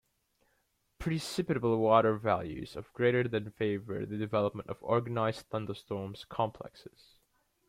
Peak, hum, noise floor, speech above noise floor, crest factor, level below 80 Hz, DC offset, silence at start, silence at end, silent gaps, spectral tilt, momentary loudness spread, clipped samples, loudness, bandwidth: -10 dBFS; none; -76 dBFS; 44 dB; 22 dB; -60 dBFS; under 0.1%; 1 s; 0.8 s; none; -6.5 dB/octave; 14 LU; under 0.1%; -32 LUFS; 16 kHz